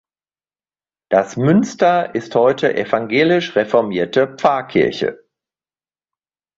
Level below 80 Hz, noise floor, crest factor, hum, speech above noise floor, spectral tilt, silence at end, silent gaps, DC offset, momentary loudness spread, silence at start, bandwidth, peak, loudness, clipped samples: -58 dBFS; under -90 dBFS; 16 dB; none; over 74 dB; -6 dB/octave; 1.4 s; none; under 0.1%; 4 LU; 1.1 s; 7.8 kHz; -2 dBFS; -16 LUFS; under 0.1%